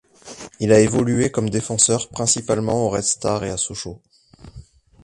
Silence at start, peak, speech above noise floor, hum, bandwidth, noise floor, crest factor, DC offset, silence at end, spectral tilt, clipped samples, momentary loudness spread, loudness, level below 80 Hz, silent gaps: 0.25 s; 0 dBFS; 24 dB; none; 11.5 kHz; -44 dBFS; 20 dB; under 0.1%; 0.4 s; -4 dB/octave; under 0.1%; 17 LU; -19 LUFS; -46 dBFS; none